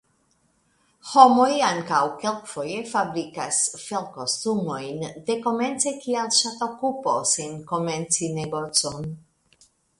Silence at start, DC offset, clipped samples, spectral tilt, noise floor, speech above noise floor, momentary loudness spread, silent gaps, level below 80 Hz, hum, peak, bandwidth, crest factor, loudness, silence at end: 1.05 s; under 0.1%; under 0.1%; -3 dB/octave; -66 dBFS; 43 dB; 11 LU; none; -64 dBFS; none; 0 dBFS; 11.5 kHz; 24 dB; -23 LUFS; 0.8 s